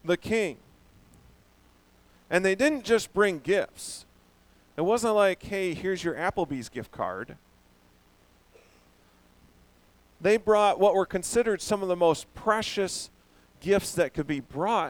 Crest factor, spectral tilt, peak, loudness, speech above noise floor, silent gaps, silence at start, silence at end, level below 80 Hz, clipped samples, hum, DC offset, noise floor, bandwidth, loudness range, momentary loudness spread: 20 dB; -4.5 dB/octave; -8 dBFS; -27 LUFS; 35 dB; none; 0.05 s; 0 s; -56 dBFS; under 0.1%; 60 Hz at -65 dBFS; under 0.1%; -61 dBFS; 18.5 kHz; 10 LU; 14 LU